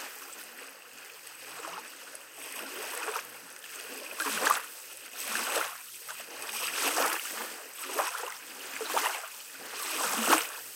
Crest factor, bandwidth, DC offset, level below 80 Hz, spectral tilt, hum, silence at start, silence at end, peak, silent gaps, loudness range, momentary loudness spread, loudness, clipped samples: 28 dB; 17 kHz; under 0.1%; under -90 dBFS; 0.5 dB/octave; none; 0 s; 0 s; -6 dBFS; none; 9 LU; 17 LU; -33 LUFS; under 0.1%